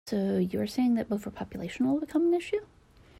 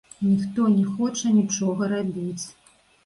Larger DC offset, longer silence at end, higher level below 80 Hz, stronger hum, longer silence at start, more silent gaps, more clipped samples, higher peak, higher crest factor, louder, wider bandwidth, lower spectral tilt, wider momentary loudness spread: neither; about the same, 0.55 s vs 0.55 s; about the same, -60 dBFS vs -62 dBFS; neither; second, 0.05 s vs 0.2 s; neither; neither; second, -16 dBFS vs -10 dBFS; about the same, 12 dB vs 14 dB; second, -29 LUFS vs -23 LUFS; first, 14 kHz vs 11.5 kHz; about the same, -7 dB/octave vs -6 dB/octave; about the same, 9 LU vs 10 LU